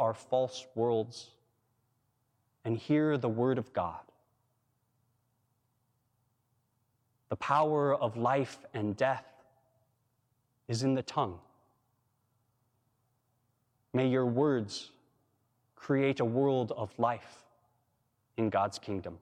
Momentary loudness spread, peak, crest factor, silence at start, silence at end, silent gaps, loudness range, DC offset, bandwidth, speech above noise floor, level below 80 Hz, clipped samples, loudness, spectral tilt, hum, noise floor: 13 LU; -14 dBFS; 20 dB; 0 s; 0.05 s; none; 6 LU; under 0.1%; 10.5 kHz; 46 dB; -74 dBFS; under 0.1%; -32 LUFS; -6.5 dB/octave; none; -77 dBFS